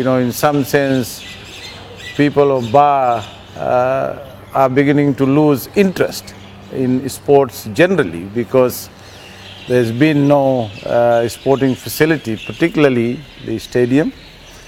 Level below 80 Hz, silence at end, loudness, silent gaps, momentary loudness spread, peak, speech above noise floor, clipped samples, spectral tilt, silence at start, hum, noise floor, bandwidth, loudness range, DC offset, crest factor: -46 dBFS; 0.05 s; -15 LUFS; none; 17 LU; 0 dBFS; 22 dB; 0.1%; -6 dB/octave; 0 s; none; -36 dBFS; 17 kHz; 2 LU; under 0.1%; 16 dB